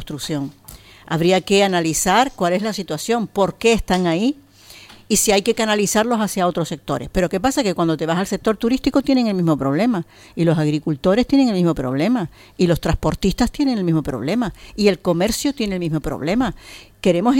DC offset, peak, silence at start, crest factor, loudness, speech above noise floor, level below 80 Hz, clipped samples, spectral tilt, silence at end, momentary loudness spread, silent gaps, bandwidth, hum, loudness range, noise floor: under 0.1%; -2 dBFS; 0 s; 16 dB; -19 LUFS; 25 dB; -38 dBFS; under 0.1%; -5 dB/octave; 0 s; 9 LU; none; 17 kHz; none; 2 LU; -44 dBFS